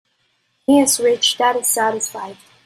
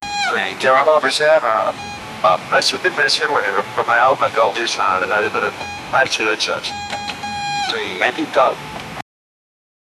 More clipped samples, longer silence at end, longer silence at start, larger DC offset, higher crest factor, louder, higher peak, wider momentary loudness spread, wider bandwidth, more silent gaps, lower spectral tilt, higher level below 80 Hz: neither; second, 0.35 s vs 1 s; first, 0.7 s vs 0 s; neither; about the same, 16 dB vs 18 dB; about the same, -16 LUFS vs -17 LUFS; about the same, -2 dBFS vs 0 dBFS; first, 14 LU vs 11 LU; first, 16 kHz vs 13.5 kHz; neither; about the same, -1.5 dB/octave vs -2.5 dB/octave; second, -64 dBFS vs -54 dBFS